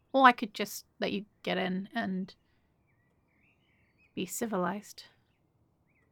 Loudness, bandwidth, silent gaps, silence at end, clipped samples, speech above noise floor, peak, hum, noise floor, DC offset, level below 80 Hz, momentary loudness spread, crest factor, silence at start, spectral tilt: -31 LUFS; over 20 kHz; none; 1.1 s; under 0.1%; 41 dB; -6 dBFS; none; -72 dBFS; under 0.1%; -76 dBFS; 20 LU; 28 dB; 0.15 s; -4.5 dB/octave